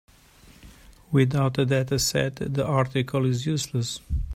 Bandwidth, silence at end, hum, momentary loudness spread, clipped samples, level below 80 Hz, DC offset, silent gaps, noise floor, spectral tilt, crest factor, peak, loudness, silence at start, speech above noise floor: 15.5 kHz; 0 s; none; 6 LU; under 0.1%; -40 dBFS; under 0.1%; none; -53 dBFS; -5.5 dB/octave; 18 dB; -8 dBFS; -25 LUFS; 0.65 s; 29 dB